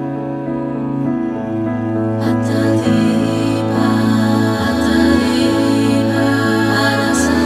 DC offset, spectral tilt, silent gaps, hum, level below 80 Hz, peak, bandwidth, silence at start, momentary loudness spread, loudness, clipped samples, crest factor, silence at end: under 0.1%; -6 dB/octave; none; none; -40 dBFS; -2 dBFS; 15 kHz; 0 s; 7 LU; -15 LUFS; under 0.1%; 14 dB; 0 s